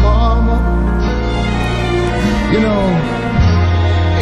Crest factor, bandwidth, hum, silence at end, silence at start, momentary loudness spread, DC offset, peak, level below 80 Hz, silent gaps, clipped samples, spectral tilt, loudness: 10 dB; 9.8 kHz; none; 0 s; 0 s; 4 LU; under 0.1%; -2 dBFS; -18 dBFS; none; under 0.1%; -7 dB/octave; -14 LUFS